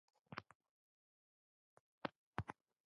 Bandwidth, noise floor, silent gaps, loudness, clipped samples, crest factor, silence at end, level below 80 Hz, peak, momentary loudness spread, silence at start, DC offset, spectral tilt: 7 kHz; under -90 dBFS; 0.55-0.60 s, 0.69-2.01 s, 2.16-2.33 s; -52 LUFS; under 0.1%; 32 dB; 0.35 s; -72 dBFS; -24 dBFS; 6 LU; 0.3 s; under 0.1%; -4.5 dB/octave